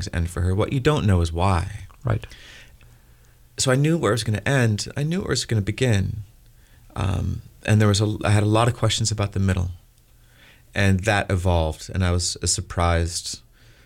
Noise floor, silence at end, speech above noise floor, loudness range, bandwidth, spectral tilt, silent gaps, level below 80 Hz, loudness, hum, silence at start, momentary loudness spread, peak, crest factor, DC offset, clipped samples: -53 dBFS; 0.5 s; 32 dB; 3 LU; 15.5 kHz; -5 dB/octave; none; -38 dBFS; -22 LUFS; none; 0 s; 11 LU; -6 dBFS; 18 dB; under 0.1%; under 0.1%